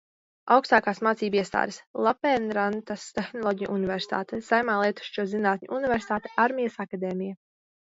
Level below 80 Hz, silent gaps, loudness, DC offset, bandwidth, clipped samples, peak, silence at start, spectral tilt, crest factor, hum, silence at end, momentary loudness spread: -62 dBFS; 1.87-1.94 s; -26 LUFS; under 0.1%; 8 kHz; under 0.1%; -4 dBFS; 0.45 s; -5.5 dB/octave; 22 dB; none; 0.6 s; 10 LU